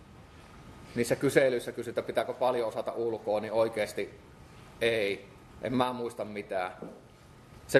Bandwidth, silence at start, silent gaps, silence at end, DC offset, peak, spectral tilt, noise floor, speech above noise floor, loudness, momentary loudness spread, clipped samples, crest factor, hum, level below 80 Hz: 13 kHz; 0 s; none; 0 s; under 0.1%; -8 dBFS; -5 dB/octave; -54 dBFS; 23 dB; -31 LUFS; 24 LU; under 0.1%; 24 dB; none; -62 dBFS